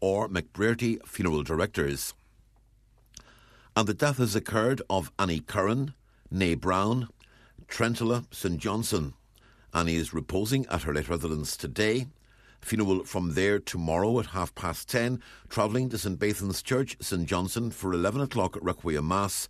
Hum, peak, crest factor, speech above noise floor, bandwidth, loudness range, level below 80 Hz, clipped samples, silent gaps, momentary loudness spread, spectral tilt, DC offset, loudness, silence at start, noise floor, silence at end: none; -6 dBFS; 22 dB; 33 dB; 14 kHz; 2 LU; -48 dBFS; under 0.1%; none; 6 LU; -5 dB/octave; under 0.1%; -29 LUFS; 0 s; -61 dBFS; 0 s